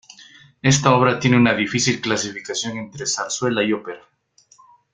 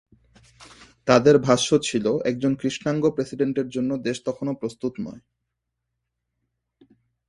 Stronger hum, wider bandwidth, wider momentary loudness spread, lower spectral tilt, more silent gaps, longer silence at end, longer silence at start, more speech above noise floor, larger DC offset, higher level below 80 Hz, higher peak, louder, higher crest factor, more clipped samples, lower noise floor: neither; second, 9.6 kHz vs 11.5 kHz; about the same, 11 LU vs 13 LU; about the same, -4 dB/octave vs -5 dB/octave; neither; second, 0.95 s vs 2.1 s; second, 0.2 s vs 0.6 s; second, 37 dB vs 58 dB; neither; first, -54 dBFS vs -60 dBFS; about the same, -2 dBFS vs 0 dBFS; first, -19 LUFS vs -22 LUFS; about the same, 20 dB vs 24 dB; neither; second, -56 dBFS vs -80 dBFS